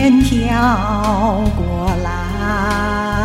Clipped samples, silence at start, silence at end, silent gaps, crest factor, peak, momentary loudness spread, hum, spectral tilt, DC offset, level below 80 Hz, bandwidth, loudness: under 0.1%; 0 s; 0 s; none; 12 dB; -2 dBFS; 6 LU; none; -6.5 dB/octave; under 0.1%; -24 dBFS; 15.5 kHz; -16 LUFS